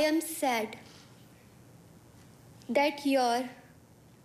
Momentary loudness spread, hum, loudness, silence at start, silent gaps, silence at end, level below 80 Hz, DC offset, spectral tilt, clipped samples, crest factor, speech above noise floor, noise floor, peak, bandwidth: 21 LU; none; -30 LUFS; 0 s; none; 0.65 s; -72 dBFS; under 0.1%; -3 dB/octave; under 0.1%; 16 dB; 28 dB; -57 dBFS; -16 dBFS; 15.5 kHz